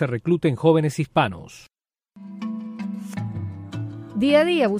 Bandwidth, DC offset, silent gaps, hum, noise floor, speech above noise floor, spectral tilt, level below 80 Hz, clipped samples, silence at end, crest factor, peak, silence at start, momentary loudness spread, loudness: 15.5 kHz; under 0.1%; none; none; -54 dBFS; 34 dB; -7 dB/octave; -58 dBFS; under 0.1%; 0 s; 18 dB; -4 dBFS; 0 s; 15 LU; -23 LUFS